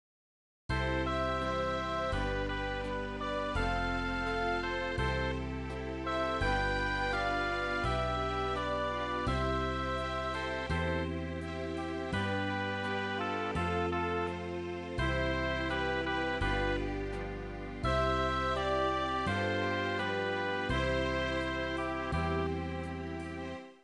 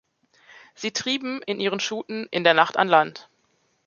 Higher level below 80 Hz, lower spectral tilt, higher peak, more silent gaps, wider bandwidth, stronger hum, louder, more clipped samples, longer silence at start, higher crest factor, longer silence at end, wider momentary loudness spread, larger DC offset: first, -44 dBFS vs -74 dBFS; first, -6 dB/octave vs -3 dB/octave; second, -20 dBFS vs -2 dBFS; neither; first, 11 kHz vs 7.4 kHz; neither; second, -34 LUFS vs -23 LUFS; neither; about the same, 0.7 s vs 0.8 s; second, 14 dB vs 22 dB; second, 0.1 s vs 0.65 s; second, 7 LU vs 11 LU; neither